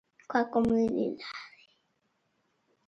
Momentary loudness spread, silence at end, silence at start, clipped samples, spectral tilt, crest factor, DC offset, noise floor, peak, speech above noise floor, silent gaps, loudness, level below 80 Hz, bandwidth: 16 LU; 1.4 s; 0.3 s; under 0.1%; -6.5 dB/octave; 20 dB; under 0.1%; -76 dBFS; -12 dBFS; 47 dB; none; -29 LUFS; -62 dBFS; 7.4 kHz